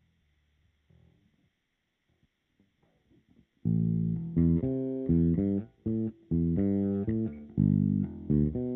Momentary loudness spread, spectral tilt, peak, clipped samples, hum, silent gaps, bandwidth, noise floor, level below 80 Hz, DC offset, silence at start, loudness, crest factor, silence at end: 7 LU; -13.5 dB/octave; -14 dBFS; under 0.1%; none; none; 2.4 kHz; -79 dBFS; -46 dBFS; under 0.1%; 3.65 s; -29 LUFS; 18 dB; 0 s